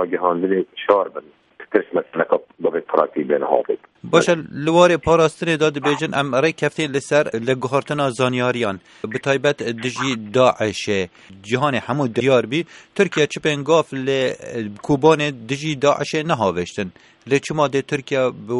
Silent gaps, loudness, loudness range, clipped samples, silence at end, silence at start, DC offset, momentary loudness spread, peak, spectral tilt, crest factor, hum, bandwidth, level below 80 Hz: none; -19 LUFS; 3 LU; under 0.1%; 0 s; 0 s; under 0.1%; 9 LU; 0 dBFS; -5 dB/octave; 20 dB; none; 11.5 kHz; -54 dBFS